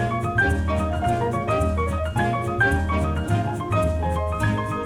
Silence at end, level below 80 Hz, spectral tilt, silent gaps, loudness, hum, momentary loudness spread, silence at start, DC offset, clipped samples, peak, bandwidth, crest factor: 0 s; -30 dBFS; -7 dB/octave; none; -23 LUFS; none; 3 LU; 0 s; under 0.1%; under 0.1%; -8 dBFS; 13 kHz; 14 dB